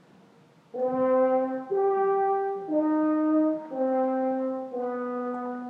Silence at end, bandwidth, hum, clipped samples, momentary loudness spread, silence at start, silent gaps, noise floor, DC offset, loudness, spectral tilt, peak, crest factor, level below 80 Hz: 0 s; 3.9 kHz; none; under 0.1%; 8 LU; 0.75 s; none; -57 dBFS; under 0.1%; -26 LUFS; -8.5 dB/octave; -14 dBFS; 12 dB; -84 dBFS